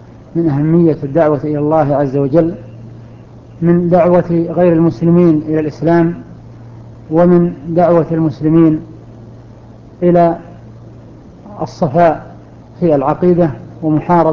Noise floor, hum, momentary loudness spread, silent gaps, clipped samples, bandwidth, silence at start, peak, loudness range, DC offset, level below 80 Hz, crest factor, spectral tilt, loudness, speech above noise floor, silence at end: -36 dBFS; none; 11 LU; none; under 0.1%; 6.4 kHz; 0.35 s; 0 dBFS; 4 LU; under 0.1%; -42 dBFS; 12 dB; -10.5 dB/octave; -12 LUFS; 25 dB; 0 s